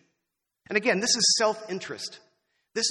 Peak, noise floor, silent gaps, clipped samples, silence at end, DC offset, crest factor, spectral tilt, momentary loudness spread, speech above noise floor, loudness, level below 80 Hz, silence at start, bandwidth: -8 dBFS; -83 dBFS; none; under 0.1%; 0 s; under 0.1%; 20 dB; -1.5 dB/octave; 16 LU; 57 dB; -24 LUFS; -74 dBFS; 0.7 s; 12 kHz